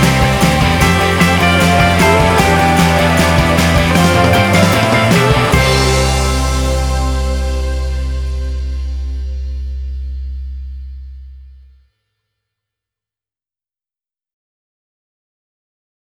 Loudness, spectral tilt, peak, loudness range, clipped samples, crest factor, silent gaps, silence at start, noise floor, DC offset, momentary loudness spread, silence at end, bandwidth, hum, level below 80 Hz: -12 LUFS; -5 dB/octave; 0 dBFS; 17 LU; under 0.1%; 14 dB; none; 0 s; under -90 dBFS; under 0.1%; 15 LU; 4.55 s; 18.5 kHz; none; -22 dBFS